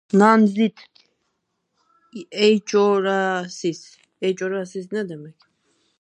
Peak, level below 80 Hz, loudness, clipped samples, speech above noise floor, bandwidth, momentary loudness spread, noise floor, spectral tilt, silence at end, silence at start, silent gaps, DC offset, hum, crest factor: -2 dBFS; -76 dBFS; -20 LUFS; under 0.1%; 54 dB; 9.8 kHz; 18 LU; -74 dBFS; -5.5 dB/octave; 0.7 s; 0.15 s; none; under 0.1%; none; 20 dB